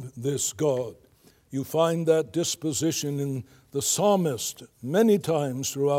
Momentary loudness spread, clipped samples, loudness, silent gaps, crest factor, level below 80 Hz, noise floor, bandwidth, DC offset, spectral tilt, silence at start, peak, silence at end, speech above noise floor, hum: 12 LU; under 0.1%; -26 LUFS; none; 16 dB; -68 dBFS; -57 dBFS; 16.5 kHz; under 0.1%; -4.5 dB/octave; 0 s; -8 dBFS; 0 s; 32 dB; none